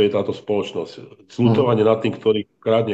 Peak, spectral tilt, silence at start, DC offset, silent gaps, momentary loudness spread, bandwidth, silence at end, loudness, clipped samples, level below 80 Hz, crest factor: -2 dBFS; -8 dB/octave; 0 s; under 0.1%; none; 13 LU; 8 kHz; 0 s; -20 LUFS; under 0.1%; -60 dBFS; 16 dB